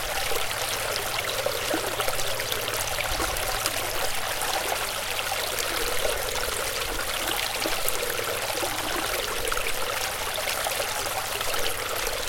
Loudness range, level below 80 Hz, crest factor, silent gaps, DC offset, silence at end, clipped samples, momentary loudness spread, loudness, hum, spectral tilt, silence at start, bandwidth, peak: 0 LU; -42 dBFS; 26 dB; none; under 0.1%; 0 s; under 0.1%; 2 LU; -26 LUFS; none; -1 dB/octave; 0 s; 17 kHz; -2 dBFS